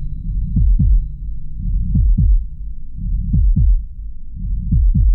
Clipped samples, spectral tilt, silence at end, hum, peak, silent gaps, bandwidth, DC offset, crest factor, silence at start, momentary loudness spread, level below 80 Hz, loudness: under 0.1%; -15.5 dB/octave; 0 s; none; -6 dBFS; none; 0.5 kHz; under 0.1%; 10 dB; 0 s; 16 LU; -16 dBFS; -19 LUFS